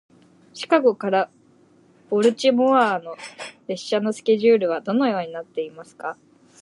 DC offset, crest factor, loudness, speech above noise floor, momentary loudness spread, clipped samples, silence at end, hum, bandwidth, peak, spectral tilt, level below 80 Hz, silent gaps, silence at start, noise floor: under 0.1%; 18 dB; -21 LUFS; 35 dB; 17 LU; under 0.1%; 0.5 s; none; 11 kHz; -4 dBFS; -5 dB/octave; -78 dBFS; none; 0.55 s; -55 dBFS